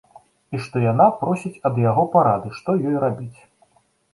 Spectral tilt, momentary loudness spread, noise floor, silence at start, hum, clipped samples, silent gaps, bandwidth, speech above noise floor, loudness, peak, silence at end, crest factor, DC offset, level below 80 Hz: -9 dB/octave; 14 LU; -61 dBFS; 0.5 s; none; under 0.1%; none; 11.5 kHz; 42 dB; -20 LUFS; -2 dBFS; 0.8 s; 18 dB; under 0.1%; -58 dBFS